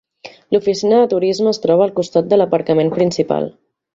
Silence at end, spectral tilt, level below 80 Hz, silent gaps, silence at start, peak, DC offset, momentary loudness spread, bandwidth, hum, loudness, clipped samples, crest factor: 0.45 s; -6 dB/octave; -58 dBFS; none; 0.25 s; -2 dBFS; under 0.1%; 6 LU; 7.8 kHz; none; -15 LUFS; under 0.1%; 14 dB